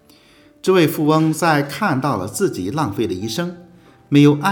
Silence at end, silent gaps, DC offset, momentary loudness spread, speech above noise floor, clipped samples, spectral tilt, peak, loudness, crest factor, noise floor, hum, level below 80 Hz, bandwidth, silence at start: 0 s; none; under 0.1%; 10 LU; 33 dB; under 0.1%; -6 dB/octave; 0 dBFS; -18 LUFS; 18 dB; -50 dBFS; none; -62 dBFS; over 20 kHz; 0.65 s